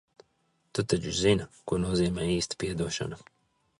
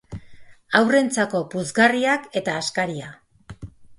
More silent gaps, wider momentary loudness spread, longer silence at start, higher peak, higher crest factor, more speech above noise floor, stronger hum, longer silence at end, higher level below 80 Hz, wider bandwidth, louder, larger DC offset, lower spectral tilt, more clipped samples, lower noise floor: neither; second, 9 LU vs 23 LU; first, 0.75 s vs 0.1 s; second, -10 dBFS vs -2 dBFS; about the same, 20 dB vs 22 dB; first, 44 dB vs 22 dB; neither; first, 0.6 s vs 0.05 s; first, -48 dBFS vs -54 dBFS; about the same, 11.5 kHz vs 11.5 kHz; second, -29 LUFS vs -21 LUFS; neither; about the same, -5 dB/octave vs -4 dB/octave; neither; first, -72 dBFS vs -43 dBFS